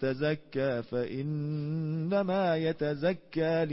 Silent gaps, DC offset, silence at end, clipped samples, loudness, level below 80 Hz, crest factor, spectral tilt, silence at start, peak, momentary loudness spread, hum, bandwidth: none; under 0.1%; 0 s; under 0.1%; -31 LUFS; -64 dBFS; 14 dB; -11 dB/octave; 0 s; -16 dBFS; 5 LU; none; 5.8 kHz